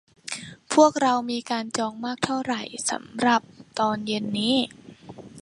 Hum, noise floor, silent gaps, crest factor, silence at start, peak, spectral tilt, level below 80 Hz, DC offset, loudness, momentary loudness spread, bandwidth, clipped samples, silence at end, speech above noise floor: none; -44 dBFS; none; 22 dB; 0.25 s; -4 dBFS; -3.5 dB/octave; -66 dBFS; under 0.1%; -24 LUFS; 16 LU; 11.5 kHz; under 0.1%; 0 s; 20 dB